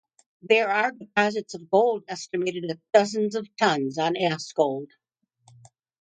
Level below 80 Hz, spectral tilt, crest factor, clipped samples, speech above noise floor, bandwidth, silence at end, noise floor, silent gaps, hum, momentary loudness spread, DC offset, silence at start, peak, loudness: -74 dBFS; -4.5 dB/octave; 20 dB; under 0.1%; 38 dB; 9.4 kHz; 1.15 s; -62 dBFS; none; none; 10 LU; under 0.1%; 0.45 s; -4 dBFS; -24 LUFS